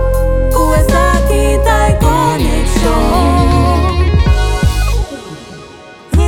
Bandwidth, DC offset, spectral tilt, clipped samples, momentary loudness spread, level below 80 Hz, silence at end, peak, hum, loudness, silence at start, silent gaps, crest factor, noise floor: 17.5 kHz; under 0.1%; -6 dB/octave; under 0.1%; 10 LU; -14 dBFS; 0 s; 0 dBFS; none; -12 LUFS; 0 s; none; 10 dB; -34 dBFS